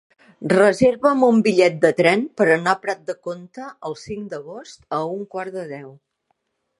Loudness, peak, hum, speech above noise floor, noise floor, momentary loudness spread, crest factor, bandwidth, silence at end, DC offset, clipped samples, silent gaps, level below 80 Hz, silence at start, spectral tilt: -18 LUFS; -2 dBFS; none; 52 dB; -71 dBFS; 18 LU; 20 dB; 11.5 kHz; 0.9 s; under 0.1%; under 0.1%; none; -58 dBFS; 0.4 s; -5.5 dB/octave